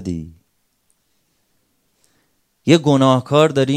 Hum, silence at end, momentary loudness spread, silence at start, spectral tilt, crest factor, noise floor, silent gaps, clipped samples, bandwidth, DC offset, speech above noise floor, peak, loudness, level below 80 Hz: none; 0 s; 16 LU; 0 s; -6.5 dB/octave; 18 dB; -66 dBFS; none; under 0.1%; 13 kHz; under 0.1%; 52 dB; 0 dBFS; -15 LUFS; -56 dBFS